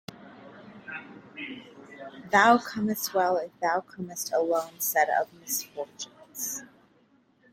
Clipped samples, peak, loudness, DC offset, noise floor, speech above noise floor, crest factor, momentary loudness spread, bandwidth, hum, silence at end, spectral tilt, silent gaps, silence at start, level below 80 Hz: under 0.1%; -6 dBFS; -27 LUFS; under 0.1%; -64 dBFS; 37 dB; 24 dB; 23 LU; 16.5 kHz; none; 0.9 s; -3 dB/octave; none; 0.2 s; -74 dBFS